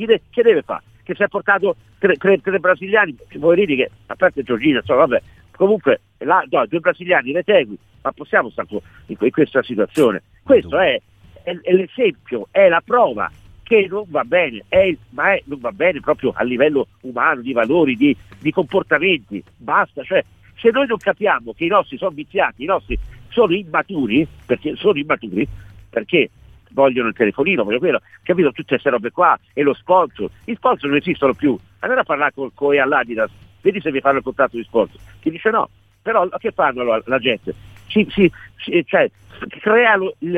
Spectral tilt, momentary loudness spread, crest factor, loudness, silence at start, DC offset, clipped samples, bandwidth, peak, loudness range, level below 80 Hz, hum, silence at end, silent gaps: -7 dB/octave; 10 LU; 18 dB; -18 LUFS; 0 s; under 0.1%; under 0.1%; 10.5 kHz; 0 dBFS; 2 LU; -46 dBFS; none; 0 s; none